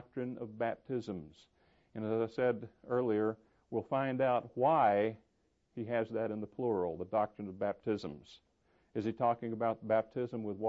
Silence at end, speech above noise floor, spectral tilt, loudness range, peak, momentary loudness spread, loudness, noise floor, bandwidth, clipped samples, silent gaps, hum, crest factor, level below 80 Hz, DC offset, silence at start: 0 s; 42 dB; -6 dB/octave; 4 LU; -18 dBFS; 12 LU; -35 LUFS; -76 dBFS; 7.6 kHz; under 0.1%; none; none; 18 dB; -72 dBFS; under 0.1%; 0 s